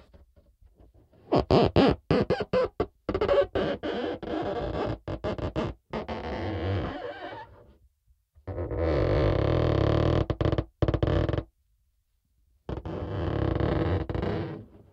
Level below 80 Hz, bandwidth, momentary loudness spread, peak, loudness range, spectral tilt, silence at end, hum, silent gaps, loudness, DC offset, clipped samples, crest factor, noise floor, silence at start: -40 dBFS; 7.8 kHz; 14 LU; -6 dBFS; 8 LU; -8.5 dB/octave; 0.15 s; none; none; -28 LUFS; under 0.1%; under 0.1%; 22 dB; -72 dBFS; 1.3 s